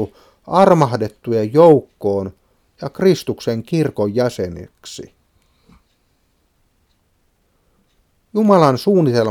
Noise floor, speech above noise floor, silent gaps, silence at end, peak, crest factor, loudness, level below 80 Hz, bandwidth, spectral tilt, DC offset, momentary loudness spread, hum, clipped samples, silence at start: -62 dBFS; 47 dB; none; 0 s; 0 dBFS; 18 dB; -16 LUFS; -54 dBFS; 16 kHz; -7 dB/octave; under 0.1%; 20 LU; none; under 0.1%; 0 s